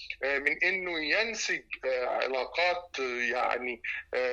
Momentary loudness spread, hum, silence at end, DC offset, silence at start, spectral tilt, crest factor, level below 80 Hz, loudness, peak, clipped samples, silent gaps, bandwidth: 6 LU; none; 0 s; under 0.1%; 0 s; -1.5 dB/octave; 18 dB; -62 dBFS; -30 LUFS; -12 dBFS; under 0.1%; none; 8.6 kHz